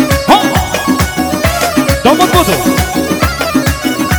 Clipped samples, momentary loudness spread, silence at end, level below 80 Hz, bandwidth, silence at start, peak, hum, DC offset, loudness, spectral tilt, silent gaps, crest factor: 1%; 5 LU; 0 s; -24 dBFS; over 20 kHz; 0 s; 0 dBFS; none; under 0.1%; -11 LUFS; -4.5 dB/octave; none; 10 dB